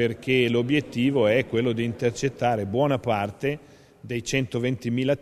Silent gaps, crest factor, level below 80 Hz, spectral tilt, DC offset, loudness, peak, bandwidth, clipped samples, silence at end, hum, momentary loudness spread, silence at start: none; 16 dB; -56 dBFS; -6 dB/octave; under 0.1%; -24 LUFS; -8 dBFS; 13.5 kHz; under 0.1%; 0 s; none; 7 LU; 0 s